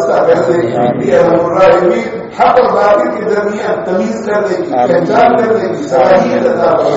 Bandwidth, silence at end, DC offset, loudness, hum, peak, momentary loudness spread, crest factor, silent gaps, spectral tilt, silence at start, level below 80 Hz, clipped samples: 8 kHz; 0 s; under 0.1%; -10 LUFS; none; 0 dBFS; 6 LU; 10 dB; none; -5 dB/octave; 0 s; -46 dBFS; under 0.1%